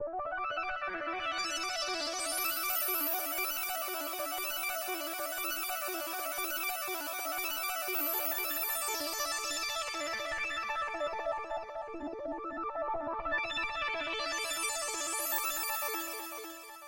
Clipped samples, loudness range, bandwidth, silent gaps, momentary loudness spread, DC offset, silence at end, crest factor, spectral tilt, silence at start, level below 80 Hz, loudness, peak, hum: under 0.1%; 4 LU; 16 kHz; none; 7 LU; under 0.1%; 0 s; 16 dB; 0 dB/octave; 0 s; -62 dBFS; -34 LUFS; -20 dBFS; none